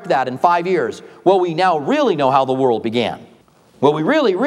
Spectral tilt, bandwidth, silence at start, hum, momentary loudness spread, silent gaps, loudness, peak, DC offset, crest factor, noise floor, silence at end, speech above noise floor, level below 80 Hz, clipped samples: -6 dB/octave; 11 kHz; 0 s; none; 5 LU; none; -17 LUFS; 0 dBFS; under 0.1%; 16 dB; -50 dBFS; 0 s; 34 dB; -66 dBFS; under 0.1%